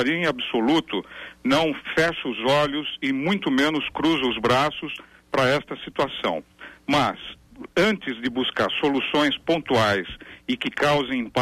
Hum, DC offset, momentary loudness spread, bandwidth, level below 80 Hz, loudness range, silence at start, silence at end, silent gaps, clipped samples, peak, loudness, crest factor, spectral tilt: none; under 0.1%; 11 LU; 15 kHz; -54 dBFS; 2 LU; 0 s; 0 s; none; under 0.1%; -10 dBFS; -23 LUFS; 14 dB; -5 dB/octave